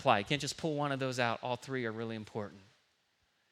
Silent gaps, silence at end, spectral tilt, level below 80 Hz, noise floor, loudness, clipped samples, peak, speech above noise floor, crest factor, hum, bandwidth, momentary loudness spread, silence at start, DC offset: none; 0.9 s; -4.5 dB/octave; -72 dBFS; -76 dBFS; -35 LUFS; under 0.1%; -12 dBFS; 41 dB; 24 dB; none; 14.5 kHz; 11 LU; 0 s; under 0.1%